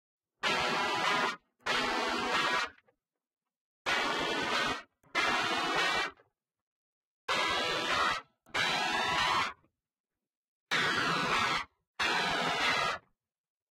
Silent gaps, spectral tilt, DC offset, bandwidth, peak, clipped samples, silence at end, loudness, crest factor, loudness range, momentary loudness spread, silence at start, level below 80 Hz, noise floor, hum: 3.56-3.85 s, 6.61-7.28 s, 10.00-10.04 s, 10.37-10.66 s, 11.87-11.94 s; -2 dB/octave; under 0.1%; 16 kHz; -16 dBFS; under 0.1%; 0.75 s; -31 LUFS; 18 dB; 2 LU; 8 LU; 0.45 s; -64 dBFS; -76 dBFS; none